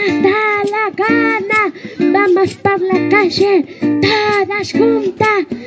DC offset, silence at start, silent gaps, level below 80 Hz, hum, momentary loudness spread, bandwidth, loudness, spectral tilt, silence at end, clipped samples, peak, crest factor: under 0.1%; 0 s; none; -50 dBFS; none; 4 LU; 8 kHz; -13 LUFS; -5.5 dB/octave; 0 s; under 0.1%; 0 dBFS; 14 dB